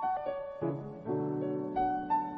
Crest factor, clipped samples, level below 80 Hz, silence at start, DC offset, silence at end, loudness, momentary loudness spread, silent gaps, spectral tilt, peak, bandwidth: 14 dB; under 0.1%; -62 dBFS; 0 s; under 0.1%; 0 s; -34 LUFS; 5 LU; none; -10 dB/octave; -20 dBFS; 5.8 kHz